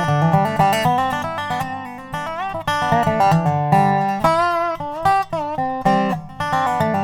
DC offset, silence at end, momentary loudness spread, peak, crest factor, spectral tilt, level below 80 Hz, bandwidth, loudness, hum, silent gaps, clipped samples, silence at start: under 0.1%; 0 s; 9 LU; -2 dBFS; 18 dB; -6 dB/octave; -46 dBFS; 18 kHz; -19 LUFS; none; none; under 0.1%; 0 s